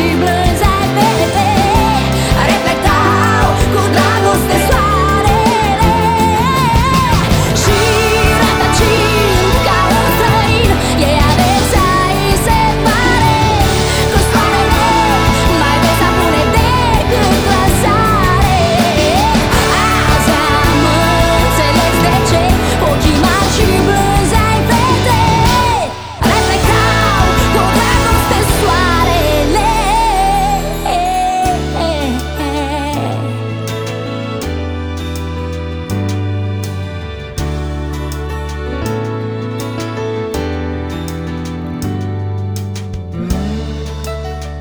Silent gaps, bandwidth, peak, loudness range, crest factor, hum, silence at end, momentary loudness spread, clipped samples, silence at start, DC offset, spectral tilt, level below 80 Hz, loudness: none; over 20 kHz; 0 dBFS; 10 LU; 12 dB; none; 0 s; 11 LU; under 0.1%; 0 s; 0.3%; -5 dB/octave; -20 dBFS; -12 LUFS